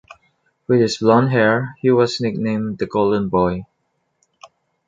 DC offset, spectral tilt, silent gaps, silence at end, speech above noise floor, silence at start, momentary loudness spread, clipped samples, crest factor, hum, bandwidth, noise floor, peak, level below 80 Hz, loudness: under 0.1%; -6.5 dB/octave; none; 1.25 s; 53 dB; 0.7 s; 8 LU; under 0.1%; 18 dB; none; 9 kHz; -70 dBFS; -2 dBFS; -50 dBFS; -18 LUFS